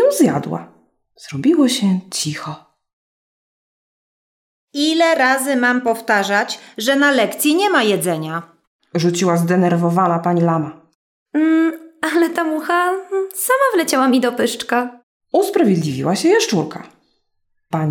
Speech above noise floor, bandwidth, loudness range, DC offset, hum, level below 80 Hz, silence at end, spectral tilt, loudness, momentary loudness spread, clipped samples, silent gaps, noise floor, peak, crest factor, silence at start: 51 dB; 17.5 kHz; 5 LU; under 0.1%; none; -68 dBFS; 0 s; -4.5 dB/octave; -17 LUFS; 11 LU; under 0.1%; 2.93-4.68 s, 8.67-8.79 s, 10.95-11.26 s, 15.03-15.20 s; -67 dBFS; -2 dBFS; 14 dB; 0 s